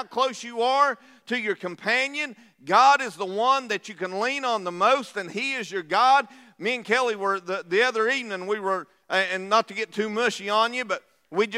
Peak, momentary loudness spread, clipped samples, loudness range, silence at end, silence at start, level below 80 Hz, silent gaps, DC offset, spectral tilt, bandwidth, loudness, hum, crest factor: -6 dBFS; 11 LU; under 0.1%; 2 LU; 0 s; 0 s; -86 dBFS; none; under 0.1%; -3 dB/octave; 14.5 kHz; -24 LUFS; none; 20 dB